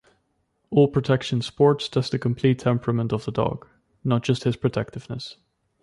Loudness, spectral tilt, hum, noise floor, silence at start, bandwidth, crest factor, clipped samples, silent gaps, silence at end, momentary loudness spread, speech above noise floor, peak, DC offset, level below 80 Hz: -23 LUFS; -7 dB/octave; none; -71 dBFS; 0.7 s; 11 kHz; 18 dB; under 0.1%; none; 0.5 s; 13 LU; 49 dB; -6 dBFS; under 0.1%; -54 dBFS